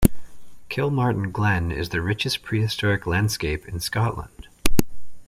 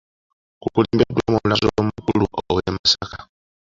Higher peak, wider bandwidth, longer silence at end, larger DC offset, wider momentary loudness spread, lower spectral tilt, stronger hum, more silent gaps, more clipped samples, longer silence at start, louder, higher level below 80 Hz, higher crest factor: about the same, 0 dBFS vs -2 dBFS; first, 16.5 kHz vs 7.6 kHz; second, 0.05 s vs 0.45 s; neither; about the same, 6 LU vs 7 LU; about the same, -5 dB/octave vs -5.5 dB/octave; neither; second, none vs 2.79-2.84 s; neither; second, 0 s vs 0.65 s; second, -24 LUFS vs -20 LUFS; first, -34 dBFS vs -42 dBFS; about the same, 22 dB vs 20 dB